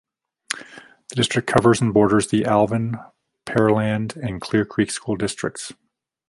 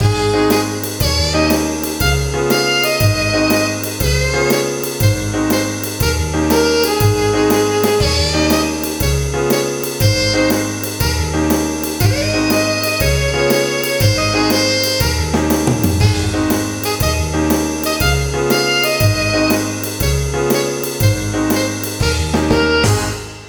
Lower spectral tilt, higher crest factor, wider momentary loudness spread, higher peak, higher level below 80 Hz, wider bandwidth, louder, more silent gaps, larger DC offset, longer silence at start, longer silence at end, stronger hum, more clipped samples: about the same, -5.5 dB/octave vs -4.5 dB/octave; first, 20 dB vs 14 dB; first, 14 LU vs 4 LU; about the same, -2 dBFS vs 0 dBFS; second, -52 dBFS vs -26 dBFS; second, 11.5 kHz vs over 20 kHz; second, -21 LUFS vs -15 LUFS; neither; neither; first, 0.5 s vs 0 s; first, 0.6 s vs 0 s; neither; neither